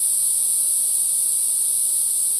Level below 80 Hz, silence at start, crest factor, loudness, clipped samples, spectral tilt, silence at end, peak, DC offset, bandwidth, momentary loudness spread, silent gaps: -66 dBFS; 0 s; 12 dB; -15 LUFS; under 0.1%; 3 dB/octave; 0 s; -6 dBFS; under 0.1%; 11 kHz; 1 LU; none